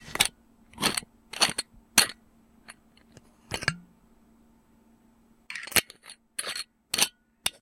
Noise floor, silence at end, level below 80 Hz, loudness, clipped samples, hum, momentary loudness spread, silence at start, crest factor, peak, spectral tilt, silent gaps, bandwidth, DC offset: -61 dBFS; 0.1 s; -58 dBFS; -27 LUFS; under 0.1%; none; 17 LU; 0 s; 32 dB; 0 dBFS; -0.5 dB/octave; none; 17 kHz; under 0.1%